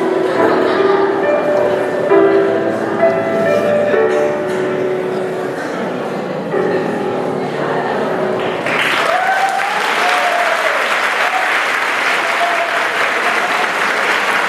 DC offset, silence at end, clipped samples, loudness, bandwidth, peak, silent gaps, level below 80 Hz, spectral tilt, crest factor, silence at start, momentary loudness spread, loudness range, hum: under 0.1%; 0 s; under 0.1%; -15 LUFS; 15 kHz; 0 dBFS; none; -62 dBFS; -4 dB/octave; 14 dB; 0 s; 6 LU; 5 LU; none